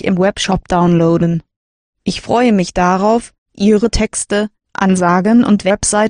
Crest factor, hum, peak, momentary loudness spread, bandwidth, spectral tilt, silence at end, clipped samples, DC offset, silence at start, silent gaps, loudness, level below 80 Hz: 12 dB; none; 0 dBFS; 7 LU; 10 kHz; -5.5 dB/octave; 0 s; under 0.1%; under 0.1%; 0.05 s; 1.56-1.93 s, 3.38-3.46 s; -14 LUFS; -34 dBFS